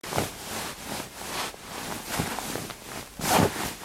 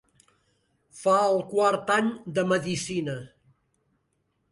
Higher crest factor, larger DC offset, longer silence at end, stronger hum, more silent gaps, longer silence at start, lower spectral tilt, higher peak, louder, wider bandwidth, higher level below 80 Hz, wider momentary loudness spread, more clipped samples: about the same, 22 dB vs 18 dB; neither; second, 0 s vs 1.25 s; neither; neither; second, 0.05 s vs 0.95 s; second, -3.5 dB/octave vs -5 dB/octave; about the same, -8 dBFS vs -10 dBFS; second, -30 LUFS vs -25 LUFS; first, 16.5 kHz vs 11.5 kHz; first, -52 dBFS vs -66 dBFS; first, 13 LU vs 8 LU; neither